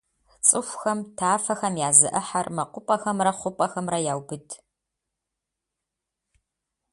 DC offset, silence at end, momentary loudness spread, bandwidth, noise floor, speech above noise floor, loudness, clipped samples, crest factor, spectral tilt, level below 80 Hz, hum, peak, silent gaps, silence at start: under 0.1%; 2.35 s; 15 LU; 11.5 kHz; -85 dBFS; 60 dB; -23 LUFS; under 0.1%; 26 dB; -3 dB/octave; -68 dBFS; none; 0 dBFS; none; 0.45 s